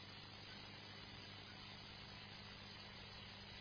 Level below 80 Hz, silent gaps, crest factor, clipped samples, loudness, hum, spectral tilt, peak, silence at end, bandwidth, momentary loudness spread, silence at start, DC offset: -70 dBFS; none; 14 dB; under 0.1%; -54 LUFS; 60 Hz at -70 dBFS; -2 dB/octave; -42 dBFS; 0 s; 5.4 kHz; 0 LU; 0 s; under 0.1%